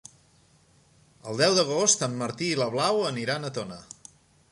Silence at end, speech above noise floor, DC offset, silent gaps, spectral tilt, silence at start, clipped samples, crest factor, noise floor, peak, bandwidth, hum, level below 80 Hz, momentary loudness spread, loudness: 0.7 s; 35 dB; under 0.1%; none; -3 dB/octave; 1.25 s; under 0.1%; 22 dB; -61 dBFS; -6 dBFS; 11.5 kHz; none; -68 dBFS; 21 LU; -25 LUFS